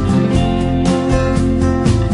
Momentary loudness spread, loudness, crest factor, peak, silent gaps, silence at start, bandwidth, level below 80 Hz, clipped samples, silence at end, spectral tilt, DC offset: 1 LU; -15 LUFS; 12 dB; 0 dBFS; none; 0 s; 11 kHz; -24 dBFS; under 0.1%; 0 s; -7 dB/octave; under 0.1%